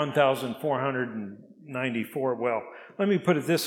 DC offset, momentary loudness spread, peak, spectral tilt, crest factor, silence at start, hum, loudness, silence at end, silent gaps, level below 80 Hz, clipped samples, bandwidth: under 0.1%; 14 LU; -8 dBFS; -5.5 dB/octave; 20 dB; 0 s; none; -28 LUFS; 0 s; none; -80 dBFS; under 0.1%; 17 kHz